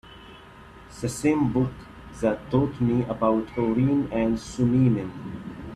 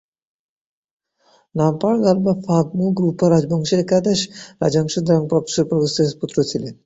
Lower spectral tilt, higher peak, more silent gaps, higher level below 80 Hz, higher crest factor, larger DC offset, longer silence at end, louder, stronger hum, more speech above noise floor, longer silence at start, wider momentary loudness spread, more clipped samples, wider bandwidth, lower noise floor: first, -7.5 dB/octave vs -6 dB/octave; second, -8 dBFS vs -2 dBFS; neither; first, -48 dBFS vs -54 dBFS; about the same, 18 dB vs 16 dB; neither; about the same, 0 s vs 0.1 s; second, -24 LUFS vs -18 LUFS; neither; second, 23 dB vs 40 dB; second, 0.05 s vs 1.55 s; first, 16 LU vs 5 LU; neither; first, 13.5 kHz vs 8 kHz; second, -46 dBFS vs -58 dBFS